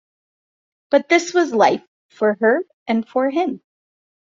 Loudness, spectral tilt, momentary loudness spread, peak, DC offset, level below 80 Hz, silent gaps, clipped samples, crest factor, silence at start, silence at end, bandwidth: -19 LUFS; -4 dB/octave; 8 LU; -2 dBFS; under 0.1%; -68 dBFS; 1.87-2.09 s, 2.74-2.86 s; under 0.1%; 18 dB; 0.9 s; 0.85 s; 7.6 kHz